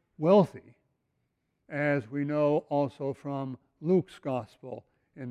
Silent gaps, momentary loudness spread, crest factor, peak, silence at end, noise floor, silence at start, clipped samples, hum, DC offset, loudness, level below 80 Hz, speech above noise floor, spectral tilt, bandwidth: none; 20 LU; 20 dB; -10 dBFS; 0 s; -78 dBFS; 0.2 s; under 0.1%; none; under 0.1%; -29 LUFS; -72 dBFS; 50 dB; -8.5 dB/octave; 10.5 kHz